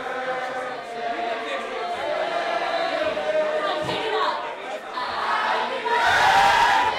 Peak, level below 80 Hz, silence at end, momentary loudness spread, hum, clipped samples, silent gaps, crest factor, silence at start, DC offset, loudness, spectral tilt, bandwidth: -6 dBFS; -56 dBFS; 0 s; 13 LU; none; under 0.1%; none; 16 dB; 0 s; under 0.1%; -23 LUFS; -2.5 dB/octave; 16.5 kHz